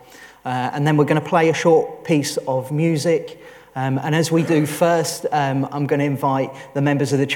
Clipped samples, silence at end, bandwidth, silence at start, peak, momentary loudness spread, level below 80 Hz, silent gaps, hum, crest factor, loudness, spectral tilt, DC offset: under 0.1%; 0 s; 18 kHz; 0.15 s; -2 dBFS; 7 LU; -64 dBFS; none; none; 16 dB; -19 LUFS; -6 dB/octave; under 0.1%